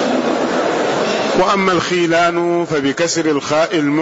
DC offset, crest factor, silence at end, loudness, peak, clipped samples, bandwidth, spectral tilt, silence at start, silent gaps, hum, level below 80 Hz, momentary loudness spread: under 0.1%; 10 dB; 0 s; -15 LUFS; -4 dBFS; under 0.1%; 8 kHz; -4 dB/octave; 0 s; none; none; -52 dBFS; 3 LU